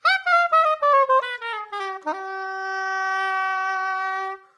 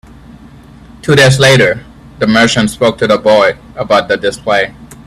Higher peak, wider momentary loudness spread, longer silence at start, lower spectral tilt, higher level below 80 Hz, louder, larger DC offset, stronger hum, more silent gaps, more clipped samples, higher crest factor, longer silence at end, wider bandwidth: second, -8 dBFS vs 0 dBFS; about the same, 12 LU vs 11 LU; second, 0.05 s vs 1.05 s; second, 0 dB/octave vs -4.5 dB/octave; second, -82 dBFS vs -40 dBFS; second, -22 LUFS vs -10 LUFS; neither; neither; neither; second, under 0.1% vs 0.1%; about the same, 14 dB vs 12 dB; about the same, 0.2 s vs 0.1 s; second, 11 kHz vs 14.5 kHz